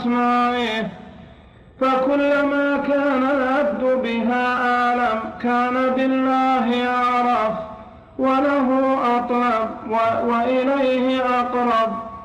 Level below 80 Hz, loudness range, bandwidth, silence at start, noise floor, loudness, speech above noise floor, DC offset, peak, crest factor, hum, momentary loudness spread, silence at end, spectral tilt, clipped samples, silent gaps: -52 dBFS; 1 LU; 9.2 kHz; 0 s; -45 dBFS; -19 LUFS; 27 dB; under 0.1%; -10 dBFS; 10 dB; none; 5 LU; 0 s; -6 dB/octave; under 0.1%; none